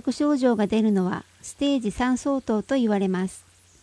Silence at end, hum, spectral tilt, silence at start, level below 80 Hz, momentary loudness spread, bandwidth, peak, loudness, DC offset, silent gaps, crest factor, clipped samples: 0.45 s; none; -6 dB/octave; 0.05 s; -52 dBFS; 7 LU; 11 kHz; -8 dBFS; -24 LUFS; under 0.1%; none; 16 dB; under 0.1%